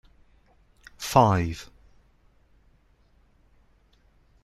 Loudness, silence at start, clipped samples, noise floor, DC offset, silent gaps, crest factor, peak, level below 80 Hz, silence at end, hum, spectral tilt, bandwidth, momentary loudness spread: -23 LUFS; 1 s; under 0.1%; -61 dBFS; under 0.1%; none; 26 dB; -4 dBFS; -52 dBFS; 2.8 s; none; -6 dB/octave; 15.5 kHz; 21 LU